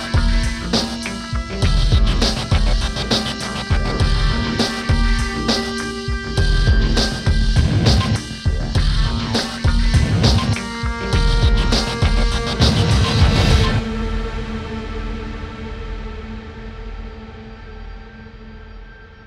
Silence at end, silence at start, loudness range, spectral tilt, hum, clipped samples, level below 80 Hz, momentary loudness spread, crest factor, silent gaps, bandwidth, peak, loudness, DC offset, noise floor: 0.05 s; 0 s; 13 LU; -5 dB/octave; none; under 0.1%; -20 dBFS; 18 LU; 16 dB; none; 11.5 kHz; -2 dBFS; -19 LUFS; under 0.1%; -38 dBFS